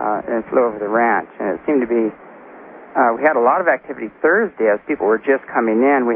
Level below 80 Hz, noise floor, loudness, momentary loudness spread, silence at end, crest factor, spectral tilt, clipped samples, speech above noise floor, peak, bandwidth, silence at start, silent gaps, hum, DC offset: -60 dBFS; -39 dBFS; -17 LUFS; 7 LU; 0 s; 16 dB; -11.5 dB/octave; under 0.1%; 22 dB; -2 dBFS; 3.5 kHz; 0 s; none; none; under 0.1%